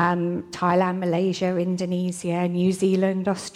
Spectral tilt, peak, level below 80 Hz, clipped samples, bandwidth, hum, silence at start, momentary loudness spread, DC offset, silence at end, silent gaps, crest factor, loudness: -6.5 dB/octave; -8 dBFS; -64 dBFS; under 0.1%; 12 kHz; none; 0 s; 5 LU; under 0.1%; 0.05 s; none; 14 dB; -23 LUFS